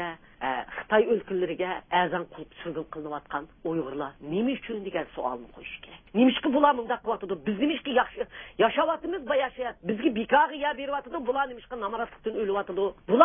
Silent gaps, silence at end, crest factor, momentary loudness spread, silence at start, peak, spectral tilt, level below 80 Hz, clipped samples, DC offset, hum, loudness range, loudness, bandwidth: none; 0 s; 24 dB; 13 LU; 0 s; -2 dBFS; -9.5 dB/octave; -60 dBFS; under 0.1%; under 0.1%; none; 6 LU; -28 LUFS; 3.7 kHz